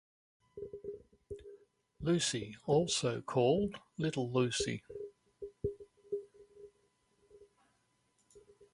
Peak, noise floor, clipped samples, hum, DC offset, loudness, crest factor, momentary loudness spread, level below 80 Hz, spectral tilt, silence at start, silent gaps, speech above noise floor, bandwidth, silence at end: -18 dBFS; -76 dBFS; under 0.1%; none; under 0.1%; -35 LUFS; 20 dB; 20 LU; -62 dBFS; -4.5 dB/octave; 0.55 s; none; 43 dB; 11.5 kHz; 0.35 s